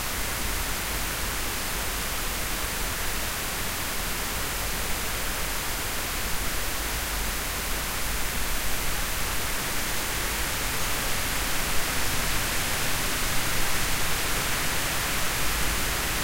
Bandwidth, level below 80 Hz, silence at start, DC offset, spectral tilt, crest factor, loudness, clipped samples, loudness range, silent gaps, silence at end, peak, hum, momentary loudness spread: 16 kHz; -34 dBFS; 0 s; under 0.1%; -2 dB/octave; 14 dB; -27 LUFS; under 0.1%; 2 LU; none; 0 s; -12 dBFS; none; 3 LU